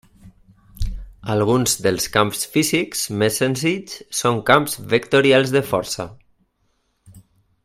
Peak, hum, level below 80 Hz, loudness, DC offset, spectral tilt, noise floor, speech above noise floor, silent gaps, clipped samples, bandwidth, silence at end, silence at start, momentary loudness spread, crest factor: 0 dBFS; none; -40 dBFS; -19 LUFS; under 0.1%; -4 dB/octave; -67 dBFS; 48 dB; none; under 0.1%; 16 kHz; 0.45 s; 0.25 s; 14 LU; 20 dB